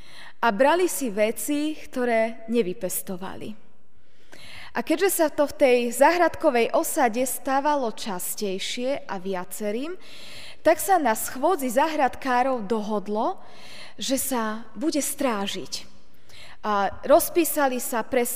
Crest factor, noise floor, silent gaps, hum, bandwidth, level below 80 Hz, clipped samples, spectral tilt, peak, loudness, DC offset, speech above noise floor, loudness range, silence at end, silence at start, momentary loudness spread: 20 dB; -62 dBFS; none; none; 16 kHz; -60 dBFS; under 0.1%; -3 dB/octave; -6 dBFS; -24 LUFS; 2%; 38 dB; 6 LU; 0 s; 0.15 s; 14 LU